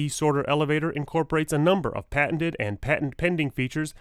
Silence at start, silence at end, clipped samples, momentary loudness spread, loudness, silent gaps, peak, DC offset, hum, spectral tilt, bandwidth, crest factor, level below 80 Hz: 0 s; 0.1 s; under 0.1%; 5 LU; -25 LUFS; none; -8 dBFS; under 0.1%; none; -5.5 dB/octave; 14.5 kHz; 16 dB; -46 dBFS